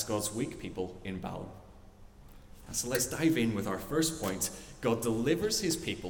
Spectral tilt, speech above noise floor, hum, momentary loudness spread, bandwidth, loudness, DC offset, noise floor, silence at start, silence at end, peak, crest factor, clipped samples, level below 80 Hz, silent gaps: -4 dB/octave; 20 dB; none; 10 LU; 18 kHz; -32 LUFS; under 0.1%; -53 dBFS; 0 s; 0 s; -16 dBFS; 18 dB; under 0.1%; -54 dBFS; none